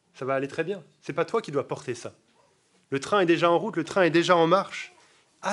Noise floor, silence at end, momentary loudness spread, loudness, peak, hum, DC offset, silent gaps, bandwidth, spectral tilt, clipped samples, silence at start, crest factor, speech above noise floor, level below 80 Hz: -65 dBFS; 0 s; 16 LU; -25 LUFS; -6 dBFS; none; under 0.1%; none; 11.5 kHz; -5 dB/octave; under 0.1%; 0.2 s; 20 dB; 40 dB; -76 dBFS